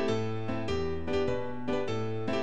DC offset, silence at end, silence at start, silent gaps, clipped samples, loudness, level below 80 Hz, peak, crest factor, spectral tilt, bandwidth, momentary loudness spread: 2%; 0 s; 0 s; none; under 0.1%; -33 LUFS; -50 dBFS; -18 dBFS; 14 dB; -6.5 dB/octave; 9.8 kHz; 3 LU